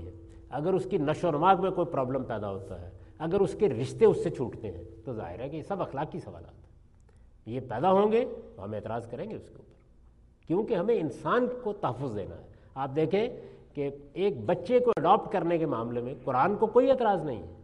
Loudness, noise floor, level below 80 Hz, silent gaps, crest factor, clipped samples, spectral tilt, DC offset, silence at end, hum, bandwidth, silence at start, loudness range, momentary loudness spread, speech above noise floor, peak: -29 LUFS; -57 dBFS; -56 dBFS; none; 20 dB; under 0.1%; -7.5 dB/octave; under 0.1%; 0 s; none; 11 kHz; 0 s; 5 LU; 17 LU; 29 dB; -8 dBFS